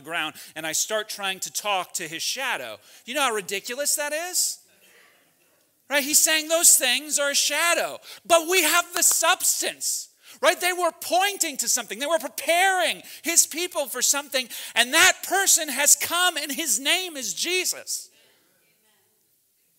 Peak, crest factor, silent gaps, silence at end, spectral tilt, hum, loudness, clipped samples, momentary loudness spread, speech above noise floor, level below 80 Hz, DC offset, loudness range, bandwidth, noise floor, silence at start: -2 dBFS; 22 dB; none; 1.7 s; 1 dB/octave; none; -21 LUFS; under 0.1%; 11 LU; 43 dB; -80 dBFS; under 0.1%; 7 LU; 16.5 kHz; -66 dBFS; 0.05 s